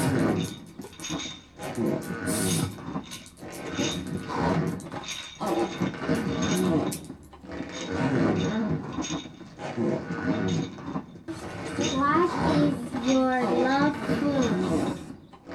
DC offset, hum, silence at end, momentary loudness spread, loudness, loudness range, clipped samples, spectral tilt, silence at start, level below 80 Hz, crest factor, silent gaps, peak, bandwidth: under 0.1%; none; 0 s; 15 LU; -28 LUFS; 6 LU; under 0.1%; -5 dB/octave; 0 s; -54 dBFS; 16 dB; none; -12 dBFS; 15.5 kHz